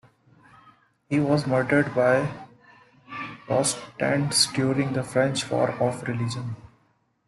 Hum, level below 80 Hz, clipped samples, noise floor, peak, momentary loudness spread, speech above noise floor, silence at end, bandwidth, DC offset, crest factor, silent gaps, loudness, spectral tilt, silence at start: none; -62 dBFS; under 0.1%; -67 dBFS; -6 dBFS; 15 LU; 43 dB; 0.6 s; 12.5 kHz; under 0.1%; 20 dB; none; -24 LUFS; -4.5 dB/octave; 1.1 s